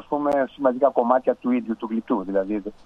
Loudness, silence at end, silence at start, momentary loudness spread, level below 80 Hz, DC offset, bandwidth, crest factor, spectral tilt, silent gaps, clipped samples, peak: -23 LUFS; 0.15 s; 0.1 s; 7 LU; -56 dBFS; under 0.1%; 7.4 kHz; 18 dB; -8 dB/octave; none; under 0.1%; -4 dBFS